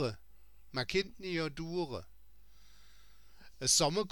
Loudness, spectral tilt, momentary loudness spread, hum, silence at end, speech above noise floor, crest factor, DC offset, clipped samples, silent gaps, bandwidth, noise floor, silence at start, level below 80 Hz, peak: -33 LUFS; -3 dB/octave; 14 LU; none; 0 s; 29 dB; 22 dB; 0.2%; under 0.1%; none; 19 kHz; -63 dBFS; 0 s; -58 dBFS; -14 dBFS